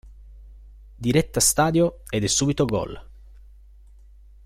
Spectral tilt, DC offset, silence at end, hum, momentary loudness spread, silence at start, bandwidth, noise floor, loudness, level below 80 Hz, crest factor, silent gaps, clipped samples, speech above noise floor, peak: -4 dB/octave; under 0.1%; 1.4 s; none; 11 LU; 0.05 s; 16.5 kHz; -48 dBFS; -21 LUFS; -44 dBFS; 20 dB; none; under 0.1%; 26 dB; -6 dBFS